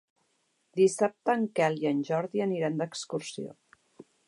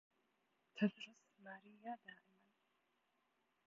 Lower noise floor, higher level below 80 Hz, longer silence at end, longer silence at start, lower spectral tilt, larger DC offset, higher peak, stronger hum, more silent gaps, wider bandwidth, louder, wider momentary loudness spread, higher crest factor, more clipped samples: second, -74 dBFS vs -84 dBFS; first, -82 dBFS vs under -90 dBFS; second, 0.25 s vs 1.55 s; about the same, 0.75 s vs 0.75 s; about the same, -5.5 dB/octave vs -5 dB/octave; neither; first, -12 dBFS vs -24 dBFS; neither; neither; first, 11.5 kHz vs 7.4 kHz; first, -29 LUFS vs -46 LUFS; second, 13 LU vs 20 LU; second, 18 dB vs 26 dB; neither